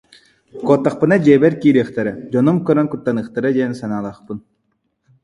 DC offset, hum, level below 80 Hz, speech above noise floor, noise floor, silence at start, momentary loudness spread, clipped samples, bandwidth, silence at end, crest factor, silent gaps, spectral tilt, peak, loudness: under 0.1%; none; -56 dBFS; 52 dB; -68 dBFS; 0.55 s; 13 LU; under 0.1%; 11 kHz; 0.85 s; 16 dB; none; -8.5 dB/octave; 0 dBFS; -16 LUFS